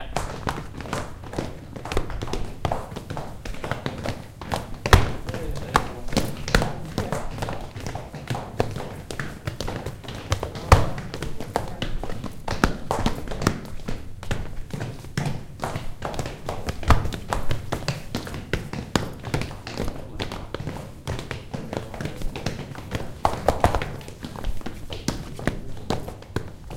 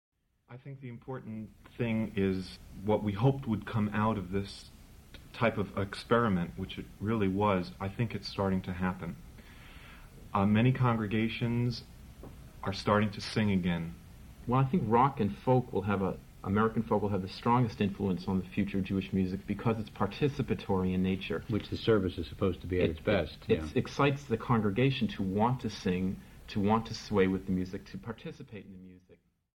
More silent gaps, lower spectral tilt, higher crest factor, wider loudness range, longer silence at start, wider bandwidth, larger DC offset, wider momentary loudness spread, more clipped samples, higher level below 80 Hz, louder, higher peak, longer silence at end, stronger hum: neither; second, -5 dB/octave vs -7.5 dB/octave; first, 26 dB vs 20 dB; first, 7 LU vs 3 LU; second, 0 s vs 0.5 s; about the same, 17 kHz vs 16.5 kHz; neither; second, 11 LU vs 16 LU; neither; first, -32 dBFS vs -52 dBFS; about the same, -29 LUFS vs -31 LUFS; first, 0 dBFS vs -12 dBFS; second, 0 s vs 0.45 s; neither